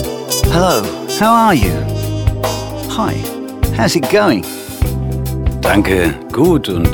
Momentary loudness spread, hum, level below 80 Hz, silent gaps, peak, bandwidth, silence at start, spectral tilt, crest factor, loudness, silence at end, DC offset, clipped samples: 8 LU; none; -24 dBFS; none; 0 dBFS; 19 kHz; 0 s; -5.5 dB/octave; 14 dB; -15 LUFS; 0 s; under 0.1%; under 0.1%